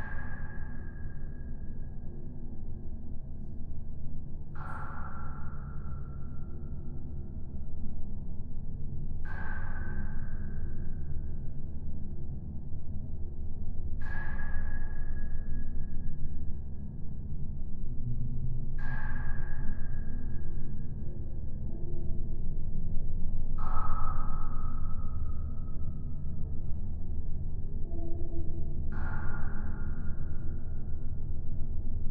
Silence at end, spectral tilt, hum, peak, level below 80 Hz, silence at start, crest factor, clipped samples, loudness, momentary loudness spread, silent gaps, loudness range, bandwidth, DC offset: 0 s; -11 dB/octave; none; -12 dBFS; -32 dBFS; 0 s; 14 dB; under 0.1%; -40 LUFS; 6 LU; none; 5 LU; 1.9 kHz; under 0.1%